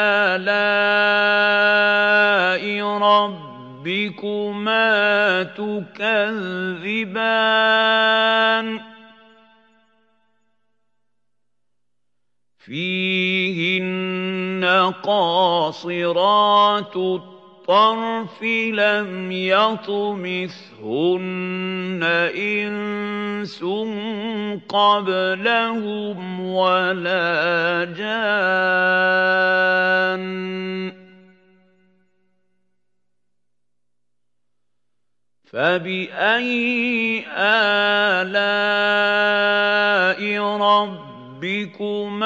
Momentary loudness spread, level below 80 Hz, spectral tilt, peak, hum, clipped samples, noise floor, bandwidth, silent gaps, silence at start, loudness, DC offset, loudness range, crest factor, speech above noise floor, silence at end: 11 LU; -82 dBFS; -5.5 dB/octave; -2 dBFS; 60 Hz at -55 dBFS; under 0.1%; -82 dBFS; 7.8 kHz; none; 0 s; -19 LUFS; under 0.1%; 7 LU; 18 dB; 63 dB; 0 s